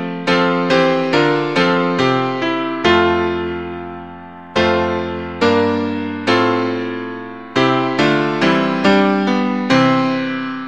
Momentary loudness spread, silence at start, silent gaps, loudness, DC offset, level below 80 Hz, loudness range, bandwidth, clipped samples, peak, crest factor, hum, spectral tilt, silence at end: 11 LU; 0 s; none; -16 LUFS; 0.5%; -48 dBFS; 3 LU; 9 kHz; under 0.1%; 0 dBFS; 16 dB; none; -6 dB/octave; 0 s